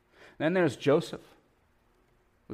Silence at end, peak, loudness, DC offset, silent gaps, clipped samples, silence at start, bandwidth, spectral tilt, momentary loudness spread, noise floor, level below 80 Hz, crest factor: 0 s; -14 dBFS; -28 LUFS; under 0.1%; none; under 0.1%; 0.4 s; 15 kHz; -6.5 dB/octave; 15 LU; -67 dBFS; -70 dBFS; 18 dB